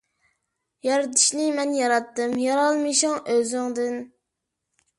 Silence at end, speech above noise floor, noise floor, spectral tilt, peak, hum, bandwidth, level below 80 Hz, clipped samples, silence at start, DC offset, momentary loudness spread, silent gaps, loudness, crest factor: 0.9 s; 59 dB; -82 dBFS; -1 dB/octave; -6 dBFS; none; 11.5 kHz; -74 dBFS; under 0.1%; 0.85 s; under 0.1%; 9 LU; none; -22 LUFS; 18 dB